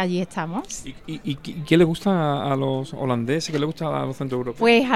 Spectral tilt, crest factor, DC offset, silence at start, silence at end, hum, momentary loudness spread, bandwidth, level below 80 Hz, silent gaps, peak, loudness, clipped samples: -6 dB/octave; 18 dB; 0.4%; 0 s; 0 s; none; 13 LU; 14.5 kHz; -52 dBFS; none; -4 dBFS; -23 LUFS; under 0.1%